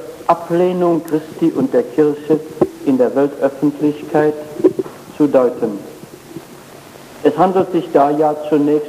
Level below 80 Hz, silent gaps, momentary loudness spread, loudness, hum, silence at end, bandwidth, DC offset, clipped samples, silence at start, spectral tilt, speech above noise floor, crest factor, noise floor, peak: -58 dBFS; none; 12 LU; -16 LUFS; none; 0 s; 15.5 kHz; under 0.1%; under 0.1%; 0 s; -7.5 dB/octave; 23 dB; 14 dB; -37 dBFS; 0 dBFS